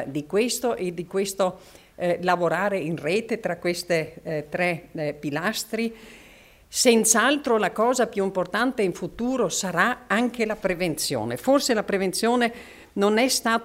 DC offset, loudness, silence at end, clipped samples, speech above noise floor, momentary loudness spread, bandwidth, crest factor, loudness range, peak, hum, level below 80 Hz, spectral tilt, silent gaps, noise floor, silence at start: under 0.1%; -24 LUFS; 0 s; under 0.1%; 27 dB; 9 LU; 16 kHz; 20 dB; 5 LU; -4 dBFS; none; -56 dBFS; -3.5 dB/octave; none; -51 dBFS; 0 s